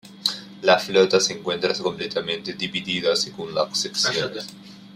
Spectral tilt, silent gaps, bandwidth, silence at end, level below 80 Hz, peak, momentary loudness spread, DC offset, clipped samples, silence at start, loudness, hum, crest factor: -2.5 dB/octave; none; 15.5 kHz; 0 s; -64 dBFS; -2 dBFS; 9 LU; under 0.1%; under 0.1%; 0.05 s; -22 LUFS; none; 22 dB